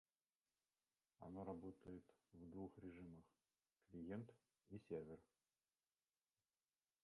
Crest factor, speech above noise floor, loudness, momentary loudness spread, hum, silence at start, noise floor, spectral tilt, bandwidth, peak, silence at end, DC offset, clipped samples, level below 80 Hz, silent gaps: 22 dB; over 33 dB; -58 LUFS; 10 LU; none; 1.2 s; under -90 dBFS; -9 dB/octave; 11 kHz; -38 dBFS; 1.8 s; under 0.1%; under 0.1%; -80 dBFS; none